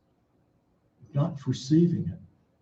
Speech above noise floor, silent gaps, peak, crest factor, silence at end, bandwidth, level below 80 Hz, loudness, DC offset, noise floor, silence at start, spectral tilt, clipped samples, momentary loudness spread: 43 dB; none; -12 dBFS; 18 dB; 0.35 s; 7.8 kHz; -64 dBFS; -27 LUFS; under 0.1%; -68 dBFS; 1.15 s; -8 dB/octave; under 0.1%; 13 LU